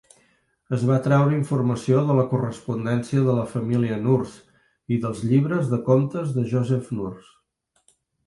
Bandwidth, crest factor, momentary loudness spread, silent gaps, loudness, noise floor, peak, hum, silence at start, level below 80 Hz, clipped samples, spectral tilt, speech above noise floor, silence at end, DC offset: 11.5 kHz; 18 dB; 8 LU; none; -22 LUFS; -70 dBFS; -6 dBFS; none; 0.7 s; -58 dBFS; under 0.1%; -8.5 dB/octave; 49 dB; 1.05 s; under 0.1%